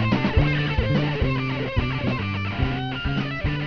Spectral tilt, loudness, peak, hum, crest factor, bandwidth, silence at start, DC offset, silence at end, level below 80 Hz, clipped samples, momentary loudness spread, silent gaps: -8 dB/octave; -24 LUFS; -6 dBFS; none; 16 dB; 5.4 kHz; 0 s; 0.6%; 0 s; -32 dBFS; under 0.1%; 5 LU; none